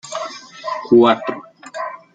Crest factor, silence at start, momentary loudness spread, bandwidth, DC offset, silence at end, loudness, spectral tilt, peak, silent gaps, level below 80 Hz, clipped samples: 16 dB; 0.05 s; 19 LU; 9.2 kHz; under 0.1%; 0.2 s; -17 LUFS; -5 dB/octave; -2 dBFS; none; -62 dBFS; under 0.1%